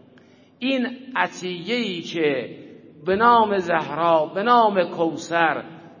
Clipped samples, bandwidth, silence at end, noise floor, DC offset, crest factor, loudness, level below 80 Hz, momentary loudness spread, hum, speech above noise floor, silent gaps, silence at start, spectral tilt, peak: under 0.1%; 7.4 kHz; 0.1 s; -52 dBFS; under 0.1%; 20 dB; -21 LUFS; -62 dBFS; 12 LU; none; 31 dB; none; 0.6 s; -5 dB/octave; -2 dBFS